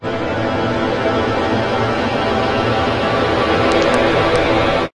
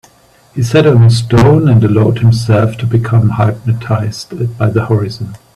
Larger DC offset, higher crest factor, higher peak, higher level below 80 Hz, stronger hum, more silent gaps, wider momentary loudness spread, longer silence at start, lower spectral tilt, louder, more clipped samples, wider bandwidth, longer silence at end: neither; about the same, 14 dB vs 10 dB; about the same, -2 dBFS vs 0 dBFS; about the same, -36 dBFS vs -38 dBFS; neither; neither; second, 4 LU vs 12 LU; second, 0 s vs 0.55 s; second, -6 dB/octave vs -7.5 dB/octave; second, -16 LUFS vs -11 LUFS; neither; about the same, 11.5 kHz vs 11.5 kHz; about the same, 0.1 s vs 0.2 s